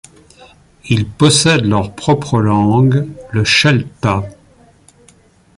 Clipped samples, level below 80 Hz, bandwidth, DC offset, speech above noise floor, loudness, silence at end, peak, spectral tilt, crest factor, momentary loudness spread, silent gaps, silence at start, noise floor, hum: under 0.1%; -40 dBFS; 11.5 kHz; under 0.1%; 35 dB; -13 LUFS; 1.25 s; 0 dBFS; -5 dB/octave; 14 dB; 8 LU; none; 0.85 s; -48 dBFS; none